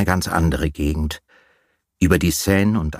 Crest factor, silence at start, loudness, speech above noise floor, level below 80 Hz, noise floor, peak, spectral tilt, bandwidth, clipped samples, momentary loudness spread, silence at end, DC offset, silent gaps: 18 dB; 0 s; -19 LUFS; 46 dB; -30 dBFS; -65 dBFS; 0 dBFS; -5.5 dB/octave; 15.5 kHz; under 0.1%; 8 LU; 0 s; under 0.1%; none